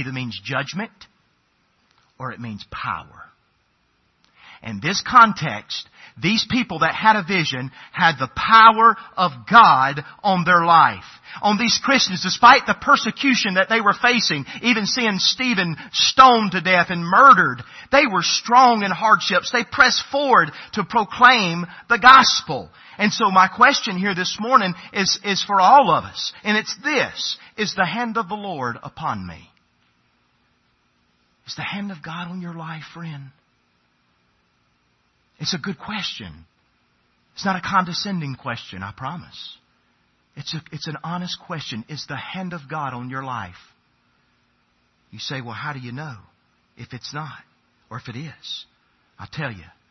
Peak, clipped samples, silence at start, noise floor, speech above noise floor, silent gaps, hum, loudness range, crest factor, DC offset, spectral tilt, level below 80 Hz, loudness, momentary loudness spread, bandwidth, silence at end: 0 dBFS; under 0.1%; 0 s; -65 dBFS; 46 dB; none; none; 19 LU; 20 dB; under 0.1%; -3.5 dB/octave; -58 dBFS; -17 LUFS; 21 LU; 6.4 kHz; 0.3 s